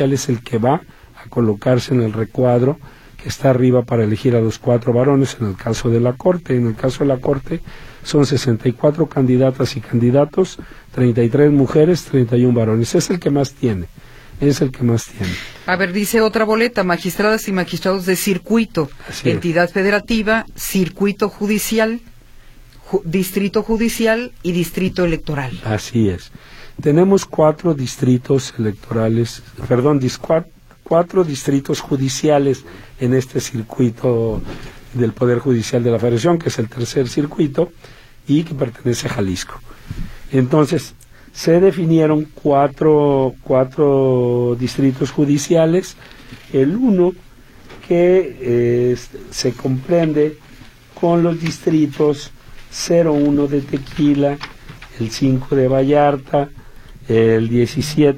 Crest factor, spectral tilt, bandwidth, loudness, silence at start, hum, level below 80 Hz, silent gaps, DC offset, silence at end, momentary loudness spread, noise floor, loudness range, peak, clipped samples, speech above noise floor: 16 dB; -6.5 dB/octave; 16.5 kHz; -17 LUFS; 0 s; none; -40 dBFS; none; under 0.1%; 0 s; 9 LU; -41 dBFS; 4 LU; -2 dBFS; under 0.1%; 25 dB